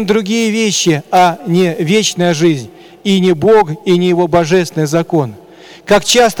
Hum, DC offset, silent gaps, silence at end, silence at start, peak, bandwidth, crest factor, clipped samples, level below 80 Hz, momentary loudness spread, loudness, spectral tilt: none; under 0.1%; none; 0 s; 0 s; -2 dBFS; 19 kHz; 10 dB; under 0.1%; -48 dBFS; 6 LU; -12 LUFS; -4.5 dB/octave